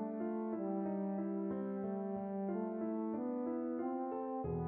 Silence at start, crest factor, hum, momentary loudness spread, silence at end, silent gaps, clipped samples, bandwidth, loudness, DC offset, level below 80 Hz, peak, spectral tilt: 0 s; 12 dB; none; 2 LU; 0 s; none; under 0.1%; 3 kHz; -40 LUFS; under 0.1%; -66 dBFS; -28 dBFS; -11 dB/octave